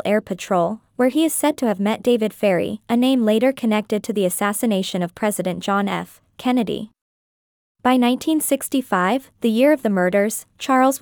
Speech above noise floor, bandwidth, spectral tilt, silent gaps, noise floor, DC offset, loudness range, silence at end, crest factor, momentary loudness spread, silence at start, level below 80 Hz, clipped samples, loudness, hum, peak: over 71 dB; 20 kHz; -4.5 dB/octave; 7.01-7.75 s; under -90 dBFS; under 0.1%; 3 LU; 0.05 s; 16 dB; 7 LU; 0.05 s; -62 dBFS; under 0.1%; -20 LUFS; none; -4 dBFS